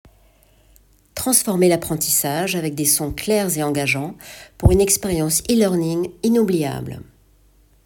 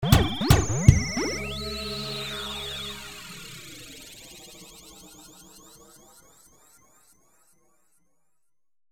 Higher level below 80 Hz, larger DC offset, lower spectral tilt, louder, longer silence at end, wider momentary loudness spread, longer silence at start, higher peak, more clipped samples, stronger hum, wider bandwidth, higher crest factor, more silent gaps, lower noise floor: about the same, -36 dBFS vs -36 dBFS; neither; about the same, -4 dB/octave vs -5 dB/octave; first, -18 LUFS vs -25 LUFS; second, 0.85 s vs 3.5 s; second, 14 LU vs 27 LU; first, 1.15 s vs 0 s; about the same, 0 dBFS vs 0 dBFS; neither; neither; about the same, 19 kHz vs 18 kHz; second, 20 dB vs 28 dB; neither; second, -54 dBFS vs -84 dBFS